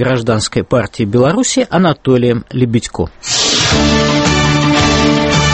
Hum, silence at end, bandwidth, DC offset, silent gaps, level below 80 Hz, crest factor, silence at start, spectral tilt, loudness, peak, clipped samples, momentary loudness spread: none; 0 s; 8.8 kHz; under 0.1%; none; -28 dBFS; 12 dB; 0 s; -4.5 dB/octave; -12 LUFS; 0 dBFS; under 0.1%; 5 LU